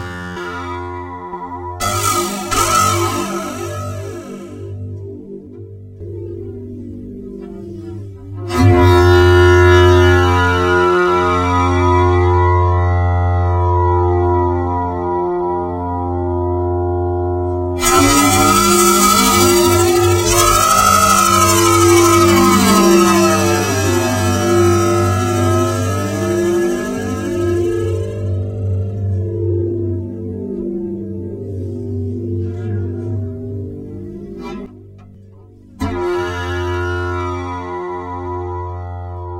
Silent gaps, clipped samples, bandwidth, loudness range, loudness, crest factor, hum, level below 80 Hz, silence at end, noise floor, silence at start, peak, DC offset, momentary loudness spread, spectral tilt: none; under 0.1%; 16 kHz; 15 LU; -14 LUFS; 14 dB; none; -32 dBFS; 0 s; -40 dBFS; 0 s; 0 dBFS; under 0.1%; 20 LU; -5 dB/octave